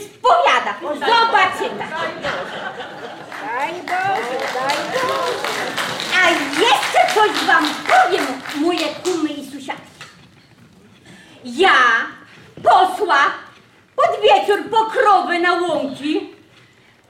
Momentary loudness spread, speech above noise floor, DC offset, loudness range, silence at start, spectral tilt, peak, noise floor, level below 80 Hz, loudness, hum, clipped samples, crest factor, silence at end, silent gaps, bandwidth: 16 LU; 34 dB; under 0.1%; 7 LU; 0 s; -2.5 dB/octave; -2 dBFS; -50 dBFS; -62 dBFS; -17 LUFS; none; under 0.1%; 16 dB; 0.75 s; none; 16.5 kHz